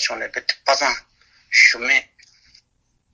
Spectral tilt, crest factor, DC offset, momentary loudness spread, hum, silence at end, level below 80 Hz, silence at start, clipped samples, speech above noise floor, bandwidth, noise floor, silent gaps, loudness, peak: 1.5 dB/octave; 20 dB; under 0.1%; 11 LU; none; 1.1 s; -60 dBFS; 0 s; under 0.1%; 49 dB; 8 kHz; -67 dBFS; none; -17 LUFS; 0 dBFS